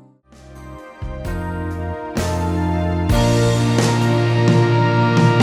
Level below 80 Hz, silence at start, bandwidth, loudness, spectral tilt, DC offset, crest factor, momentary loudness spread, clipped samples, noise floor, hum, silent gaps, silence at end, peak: -32 dBFS; 0.45 s; 13.5 kHz; -18 LUFS; -6.5 dB/octave; under 0.1%; 14 dB; 16 LU; under 0.1%; -45 dBFS; none; none; 0 s; -2 dBFS